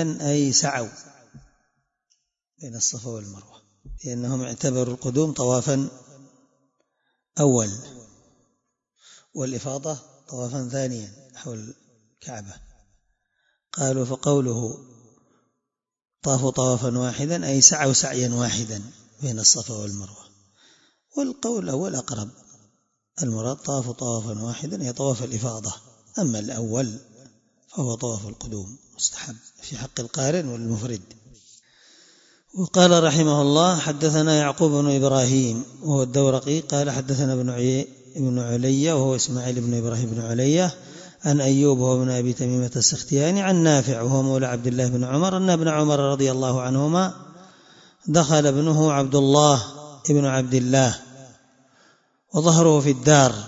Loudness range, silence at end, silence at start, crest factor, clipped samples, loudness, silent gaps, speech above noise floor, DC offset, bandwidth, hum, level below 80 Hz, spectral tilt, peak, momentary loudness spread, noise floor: 11 LU; 0 s; 0 s; 22 dB; under 0.1%; -21 LUFS; none; 62 dB; under 0.1%; 8 kHz; none; -58 dBFS; -4.5 dB/octave; 0 dBFS; 18 LU; -83 dBFS